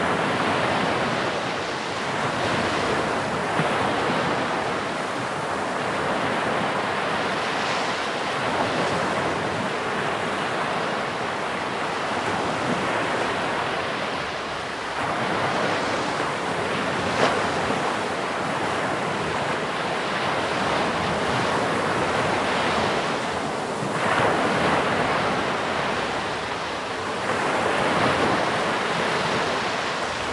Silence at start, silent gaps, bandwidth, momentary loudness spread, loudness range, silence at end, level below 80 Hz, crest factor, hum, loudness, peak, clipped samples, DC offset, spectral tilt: 0 s; none; 11.5 kHz; 5 LU; 2 LU; 0 s; -54 dBFS; 20 dB; none; -24 LUFS; -4 dBFS; under 0.1%; under 0.1%; -4 dB/octave